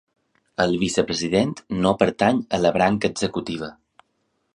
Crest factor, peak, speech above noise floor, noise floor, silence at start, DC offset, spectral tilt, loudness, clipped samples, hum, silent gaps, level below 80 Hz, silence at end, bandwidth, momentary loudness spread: 20 dB; -2 dBFS; 50 dB; -71 dBFS; 0.6 s; under 0.1%; -5 dB/octave; -22 LUFS; under 0.1%; none; none; -50 dBFS; 0.85 s; 11 kHz; 11 LU